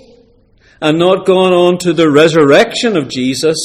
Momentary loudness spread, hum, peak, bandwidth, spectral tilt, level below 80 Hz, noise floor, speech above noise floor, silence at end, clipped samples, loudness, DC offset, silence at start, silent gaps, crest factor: 7 LU; none; 0 dBFS; 15 kHz; -5 dB/octave; -50 dBFS; -48 dBFS; 38 dB; 0 s; 0.2%; -10 LUFS; under 0.1%; 0.8 s; none; 10 dB